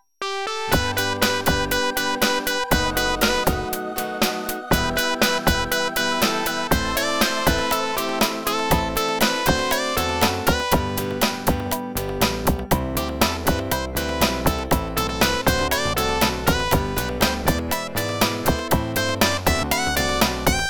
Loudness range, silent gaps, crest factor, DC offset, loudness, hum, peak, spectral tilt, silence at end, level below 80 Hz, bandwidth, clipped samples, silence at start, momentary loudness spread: 2 LU; none; 18 dB; under 0.1%; -21 LUFS; none; -4 dBFS; -3.5 dB/octave; 0 s; -32 dBFS; over 20 kHz; under 0.1%; 0.2 s; 5 LU